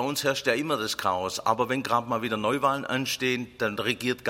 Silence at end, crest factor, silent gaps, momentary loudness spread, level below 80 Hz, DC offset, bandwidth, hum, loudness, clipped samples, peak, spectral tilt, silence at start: 0 s; 20 dB; none; 3 LU; -62 dBFS; under 0.1%; 16.5 kHz; none; -27 LUFS; under 0.1%; -8 dBFS; -3.5 dB/octave; 0 s